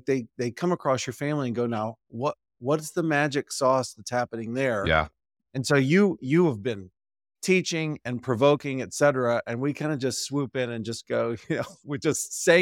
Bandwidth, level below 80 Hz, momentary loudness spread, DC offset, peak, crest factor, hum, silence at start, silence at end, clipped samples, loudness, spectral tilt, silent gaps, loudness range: 17 kHz; -54 dBFS; 10 LU; under 0.1%; -6 dBFS; 20 dB; none; 0.05 s; 0 s; under 0.1%; -26 LUFS; -5 dB/octave; none; 3 LU